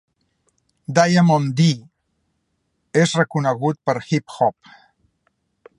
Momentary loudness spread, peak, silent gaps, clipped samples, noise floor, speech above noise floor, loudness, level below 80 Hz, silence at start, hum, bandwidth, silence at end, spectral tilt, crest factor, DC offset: 9 LU; 0 dBFS; none; under 0.1%; -71 dBFS; 53 dB; -19 LUFS; -64 dBFS; 0.9 s; none; 11 kHz; 1.25 s; -6 dB/octave; 20 dB; under 0.1%